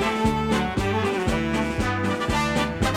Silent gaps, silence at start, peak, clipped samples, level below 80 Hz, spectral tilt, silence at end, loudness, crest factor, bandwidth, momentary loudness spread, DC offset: none; 0 s; -8 dBFS; under 0.1%; -34 dBFS; -5.5 dB/octave; 0 s; -24 LUFS; 16 dB; 16 kHz; 2 LU; under 0.1%